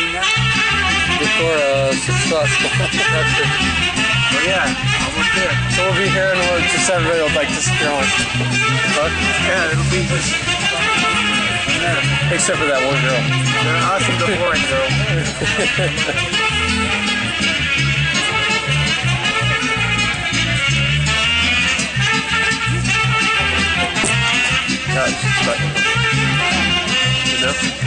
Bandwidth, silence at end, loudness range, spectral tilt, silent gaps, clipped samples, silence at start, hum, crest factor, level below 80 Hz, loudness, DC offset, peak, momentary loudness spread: 10.5 kHz; 0 s; 1 LU; -3.5 dB/octave; none; under 0.1%; 0 s; none; 14 dB; -34 dBFS; -15 LUFS; under 0.1%; -4 dBFS; 2 LU